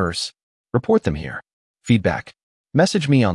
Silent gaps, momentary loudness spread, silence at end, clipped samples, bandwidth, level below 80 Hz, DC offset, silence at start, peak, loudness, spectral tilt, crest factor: 0.43-0.64 s, 1.53-1.74 s, 2.43-2.64 s; 14 LU; 0 s; under 0.1%; 12 kHz; -46 dBFS; under 0.1%; 0 s; -4 dBFS; -20 LUFS; -6 dB/octave; 16 dB